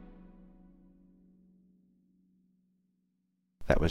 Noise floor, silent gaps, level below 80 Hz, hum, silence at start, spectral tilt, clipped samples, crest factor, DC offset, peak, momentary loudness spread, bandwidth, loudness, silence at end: -78 dBFS; none; -44 dBFS; none; 0 s; -7 dB/octave; under 0.1%; 26 dB; under 0.1%; -10 dBFS; 30 LU; 11 kHz; -33 LUFS; 0 s